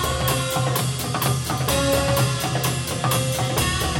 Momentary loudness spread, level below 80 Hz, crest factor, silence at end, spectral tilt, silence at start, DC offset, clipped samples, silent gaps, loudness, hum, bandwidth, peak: 4 LU; -36 dBFS; 14 dB; 0 s; -4 dB/octave; 0 s; under 0.1%; under 0.1%; none; -21 LUFS; none; 17.5 kHz; -6 dBFS